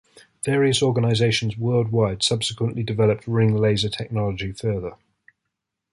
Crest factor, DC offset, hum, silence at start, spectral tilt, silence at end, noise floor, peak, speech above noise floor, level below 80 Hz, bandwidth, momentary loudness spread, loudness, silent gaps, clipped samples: 16 dB; under 0.1%; none; 0.45 s; -5.5 dB/octave; 1 s; -81 dBFS; -6 dBFS; 60 dB; -48 dBFS; 11.5 kHz; 8 LU; -22 LUFS; none; under 0.1%